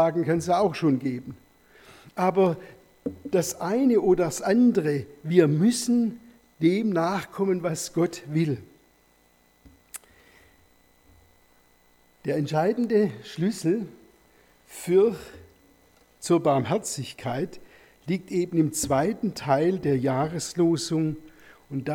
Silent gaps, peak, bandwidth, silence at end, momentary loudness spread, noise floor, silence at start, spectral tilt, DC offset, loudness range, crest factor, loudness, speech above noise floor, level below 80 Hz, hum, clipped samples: none; -6 dBFS; 18 kHz; 0 s; 16 LU; -62 dBFS; 0 s; -6 dB/octave; under 0.1%; 7 LU; 20 dB; -25 LUFS; 38 dB; -60 dBFS; none; under 0.1%